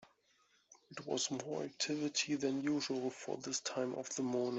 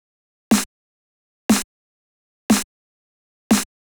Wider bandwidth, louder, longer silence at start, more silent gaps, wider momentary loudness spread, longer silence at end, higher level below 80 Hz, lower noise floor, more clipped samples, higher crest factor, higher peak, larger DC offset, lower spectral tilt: second, 8.2 kHz vs over 20 kHz; second, -38 LUFS vs -20 LUFS; first, 0.7 s vs 0.5 s; second, none vs 0.66-1.49 s, 1.64-2.49 s, 2.64-3.50 s; second, 7 LU vs 15 LU; second, 0 s vs 0.35 s; second, -82 dBFS vs -52 dBFS; second, -74 dBFS vs under -90 dBFS; neither; about the same, 18 dB vs 20 dB; second, -22 dBFS vs -4 dBFS; neither; about the same, -3 dB/octave vs -3.5 dB/octave